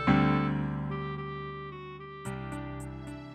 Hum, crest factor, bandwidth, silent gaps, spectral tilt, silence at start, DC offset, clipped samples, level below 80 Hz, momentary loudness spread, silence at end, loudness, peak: none; 20 dB; 10.5 kHz; none; -7.5 dB/octave; 0 s; under 0.1%; under 0.1%; -48 dBFS; 16 LU; 0 s; -33 LUFS; -12 dBFS